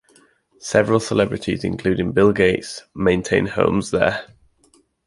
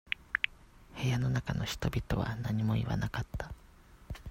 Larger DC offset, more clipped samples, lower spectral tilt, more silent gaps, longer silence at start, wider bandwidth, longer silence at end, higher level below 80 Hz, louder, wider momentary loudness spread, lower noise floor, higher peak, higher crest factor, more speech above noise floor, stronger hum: neither; neither; about the same, -5.5 dB/octave vs -6 dB/octave; neither; first, 0.6 s vs 0.05 s; second, 11.5 kHz vs 16 kHz; first, 0.85 s vs 0 s; about the same, -44 dBFS vs -48 dBFS; first, -19 LUFS vs -34 LUFS; second, 8 LU vs 14 LU; about the same, -58 dBFS vs -56 dBFS; first, -2 dBFS vs -10 dBFS; second, 18 dB vs 24 dB; first, 40 dB vs 23 dB; neither